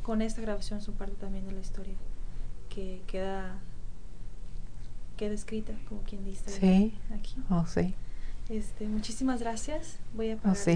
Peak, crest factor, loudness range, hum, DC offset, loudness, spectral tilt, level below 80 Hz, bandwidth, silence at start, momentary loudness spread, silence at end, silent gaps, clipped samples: -14 dBFS; 18 dB; 10 LU; none; 2%; -34 LUFS; -6.5 dB/octave; -36 dBFS; 10 kHz; 0 s; 19 LU; 0 s; none; under 0.1%